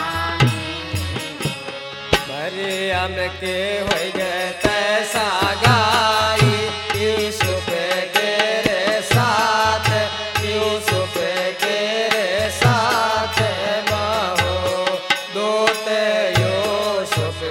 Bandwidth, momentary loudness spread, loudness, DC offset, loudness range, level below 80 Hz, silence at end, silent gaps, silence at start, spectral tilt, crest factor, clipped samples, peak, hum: 17 kHz; 7 LU; -19 LUFS; under 0.1%; 4 LU; -44 dBFS; 0 s; none; 0 s; -4 dB/octave; 20 dB; under 0.1%; 0 dBFS; none